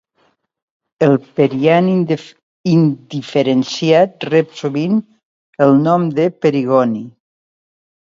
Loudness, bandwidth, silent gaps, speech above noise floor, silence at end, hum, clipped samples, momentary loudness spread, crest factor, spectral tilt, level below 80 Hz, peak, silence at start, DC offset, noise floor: -15 LUFS; 7.6 kHz; 2.43-2.64 s, 5.25-5.53 s; 47 dB; 1.1 s; none; under 0.1%; 8 LU; 16 dB; -7.5 dB/octave; -62 dBFS; 0 dBFS; 1 s; under 0.1%; -61 dBFS